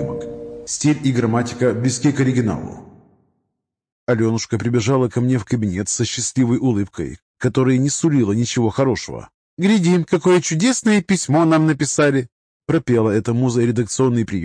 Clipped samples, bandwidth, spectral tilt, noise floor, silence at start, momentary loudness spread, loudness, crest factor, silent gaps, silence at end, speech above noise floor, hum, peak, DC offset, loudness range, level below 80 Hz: under 0.1%; 10.5 kHz; -5.5 dB/octave; -77 dBFS; 0 s; 11 LU; -18 LUFS; 14 dB; 3.92-4.07 s, 7.22-7.34 s, 9.34-9.57 s, 12.32-12.60 s; 0 s; 60 dB; none; -4 dBFS; under 0.1%; 5 LU; -50 dBFS